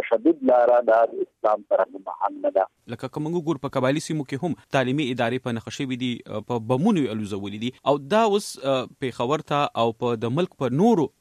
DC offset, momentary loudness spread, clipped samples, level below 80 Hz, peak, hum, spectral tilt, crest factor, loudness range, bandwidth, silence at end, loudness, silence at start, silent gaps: under 0.1%; 10 LU; under 0.1%; -66 dBFS; -6 dBFS; none; -6 dB/octave; 16 dB; 3 LU; 14.5 kHz; 0.1 s; -24 LUFS; 0 s; none